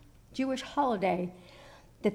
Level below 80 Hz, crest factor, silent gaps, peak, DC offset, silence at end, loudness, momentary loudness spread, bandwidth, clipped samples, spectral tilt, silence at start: -62 dBFS; 16 dB; none; -16 dBFS; under 0.1%; 0 s; -32 LUFS; 19 LU; 15 kHz; under 0.1%; -6 dB/octave; 0.3 s